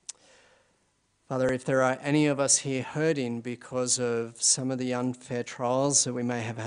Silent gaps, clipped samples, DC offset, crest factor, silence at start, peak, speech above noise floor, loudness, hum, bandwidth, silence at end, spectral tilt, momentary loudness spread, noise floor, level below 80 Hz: none; under 0.1%; under 0.1%; 20 dB; 1.3 s; -8 dBFS; 43 dB; -27 LUFS; none; 10.5 kHz; 0 s; -3.5 dB/octave; 11 LU; -71 dBFS; -66 dBFS